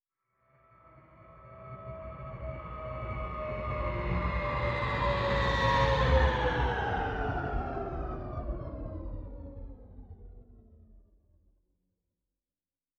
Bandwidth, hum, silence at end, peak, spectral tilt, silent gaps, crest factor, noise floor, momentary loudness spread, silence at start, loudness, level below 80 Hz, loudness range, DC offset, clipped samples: 7.8 kHz; none; 2 s; -14 dBFS; -6.5 dB/octave; none; 20 dB; under -90 dBFS; 21 LU; 0.95 s; -32 LUFS; -38 dBFS; 16 LU; under 0.1%; under 0.1%